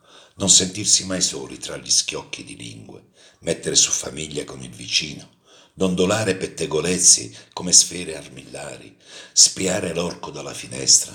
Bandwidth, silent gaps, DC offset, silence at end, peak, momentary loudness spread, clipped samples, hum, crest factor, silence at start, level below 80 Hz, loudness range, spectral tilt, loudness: over 20 kHz; none; under 0.1%; 0 s; 0 dBFS; 21 LU; under 0.1%; none; 22 dB; 0.4 s; -58 dBFS; 6 LU; -1.5 dB/octave; -17 LUFS